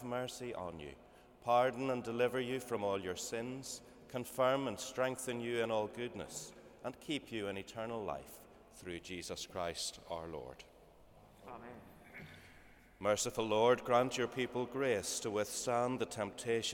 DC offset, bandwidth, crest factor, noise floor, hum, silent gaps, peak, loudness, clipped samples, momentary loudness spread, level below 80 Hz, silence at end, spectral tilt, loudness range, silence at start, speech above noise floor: under 0.1%; 19 kHz; 20 dB; -62 dBFS; none; none; -18 dBFS; -38 LUFS; under 0.1%; 20 LU; -68 dBFS; 0 s; -3.5 dB/octave; 10 LU; 0 s; 24 dB